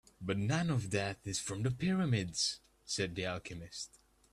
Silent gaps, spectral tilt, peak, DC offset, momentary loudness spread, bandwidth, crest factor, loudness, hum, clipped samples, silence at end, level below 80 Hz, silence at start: none; -4.5 dB/octave; -20 dBFS; under 0.1%; 12 LU; 13 kHz; 18 dB; -36 LUFS; none; under 0.1%; 0.45 s; -62 dBFS; 0.2 s